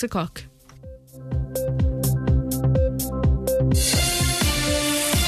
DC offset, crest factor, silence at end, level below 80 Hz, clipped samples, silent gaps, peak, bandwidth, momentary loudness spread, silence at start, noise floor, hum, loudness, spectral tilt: under 0.1%; 14 dB; 0 s; -28 dBFS; under 0.1%; none; -8 dBFS; 14 kHz; 10 LU; 0 s; -43 dBFS; none; -22 LUFS; -4.5 dB/octave